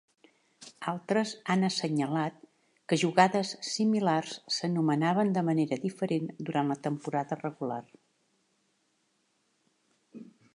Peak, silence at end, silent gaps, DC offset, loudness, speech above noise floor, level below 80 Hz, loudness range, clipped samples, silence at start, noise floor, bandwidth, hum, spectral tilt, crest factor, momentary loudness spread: -8 dBFS; 0.3 s; none; under 0.1%; -30 LUFS; 45 dB; -80 dBFS; 10 LU; under 0.1%; 0.6 s; -74 dBFS; 11 kHz; none; -5.5 dB/octave; 24 dB; 10 LU